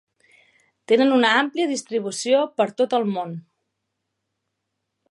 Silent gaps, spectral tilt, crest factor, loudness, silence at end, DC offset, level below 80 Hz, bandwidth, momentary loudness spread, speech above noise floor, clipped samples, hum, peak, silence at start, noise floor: none; -4 dB/octave; 20 dB; -21 LUFS; 1.7 s; under 0.1%; -80 dBFS; 11.5 kHz; 11 LU; 58 dB; under 0.1%; none; -4 dBFS; 0.9 s; -79 dBFS